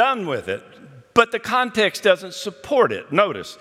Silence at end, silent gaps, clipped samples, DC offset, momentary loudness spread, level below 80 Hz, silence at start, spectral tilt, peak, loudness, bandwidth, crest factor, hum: 0.05 s; none; under 0.1%; under 0.1%; 12 LU; -62 dBFS; 0 s; -4 dB/octave; 0 dBFS; -20 LUFS; 15.5 kHz; 20 dB; none